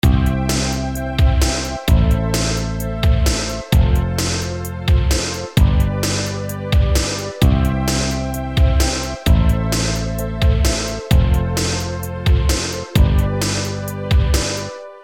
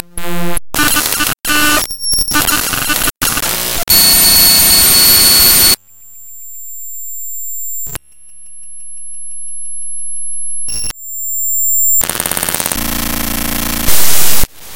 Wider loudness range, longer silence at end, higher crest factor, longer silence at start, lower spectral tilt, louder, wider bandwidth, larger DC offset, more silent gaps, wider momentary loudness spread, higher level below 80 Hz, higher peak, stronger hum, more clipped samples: second, 1 LU vs 17 LU; about the same, 0 s vs 0 s; about the same, 16 dB vs 12 dB; about the same, 0.05 s vs 0 s; first, -5 dB/octave vs -0.5 dB/octave; second, -18 LUFS vs -10 LUFS; second, 17 kHz vs over 20 kHz; neither; neither; second, 7 LU vs 20 LU; first, -20 dBFS vs -30 dBFS; about the same, -2 dBFS vs 0 dBFS; neither; second, under 0.1% vs 0.5%